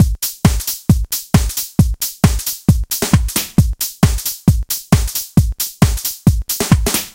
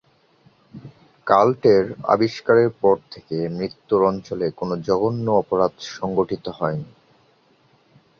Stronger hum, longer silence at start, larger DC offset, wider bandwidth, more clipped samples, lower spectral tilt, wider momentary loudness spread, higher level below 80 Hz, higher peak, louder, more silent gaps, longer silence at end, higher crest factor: neither; second, 0 s vs 0.75 s; neither; first, 17.5 kHz vs 7 kHz; neither; second, -5 dB/octave vs -7 dB/octave; second, 2 LU vs 11 LU; first, -22 dBFS vs -56 dBFS; about the same, 0 dBFS vs 0 dBFS; first, -16 LUFS vs -21 LUFS; neither; second, 0.05 s vs 1.35 s; second, 14 dB vs 20 dB